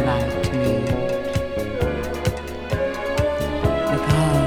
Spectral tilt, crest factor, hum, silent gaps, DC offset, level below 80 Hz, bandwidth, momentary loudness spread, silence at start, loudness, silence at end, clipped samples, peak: -6.5 dB/octave; 16 dB; none; none; under 0.1%; -34 dBFS; 18 kHz; 6 LU; 0 s; -23 LUFS; 0 s; under 0.1%; -6 dBFS